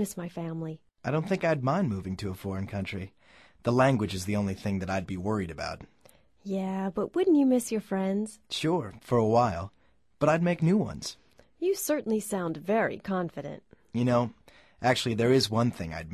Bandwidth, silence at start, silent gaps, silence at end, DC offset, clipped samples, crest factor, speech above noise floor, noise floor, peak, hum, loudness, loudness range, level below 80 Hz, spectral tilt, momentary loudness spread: 13.5 kHz; 0 s; none; 0 s; under 0.1%; under 0.1%; 18 dB; 32 dB; -60 dBFS; -10 dBFS; none; -29 LUFS; 4 LU; -54 dBFS; -6 dB/octave; 13 LU